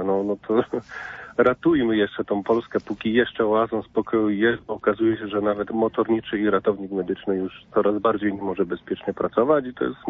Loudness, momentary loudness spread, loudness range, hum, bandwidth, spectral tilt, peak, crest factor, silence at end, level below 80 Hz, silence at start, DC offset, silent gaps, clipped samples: -23 LUFS; 7 LU; 2 LU; none; 5.8 kHz; -8 dB/octave; -6 dBFS; 16 dB; 0 s; -56 dBFS; 0 s; under 0.1%; none; under 0.1%